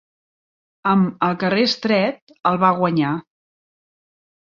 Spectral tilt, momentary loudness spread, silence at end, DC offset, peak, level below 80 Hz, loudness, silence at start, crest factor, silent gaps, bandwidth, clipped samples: -6.5 dB/octave; 7 LU; 1.2 s; under 0.1%; -2 dBFS; -64 dBFS; -19 LUFS; 0.85 s; 18 dB; 2.22-2.27 s; 7.2 kHz; under 0.1%